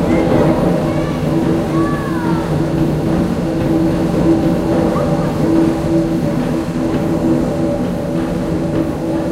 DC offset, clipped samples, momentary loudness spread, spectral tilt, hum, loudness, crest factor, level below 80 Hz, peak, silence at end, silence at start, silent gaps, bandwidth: under 0.1%; under 0.1%; 5 LU; -8 dB/octave; none; -16 LUFS; 14 dB; -32 dBFS; 0 dBFS; 0 s; 0 s; none; 15 kHz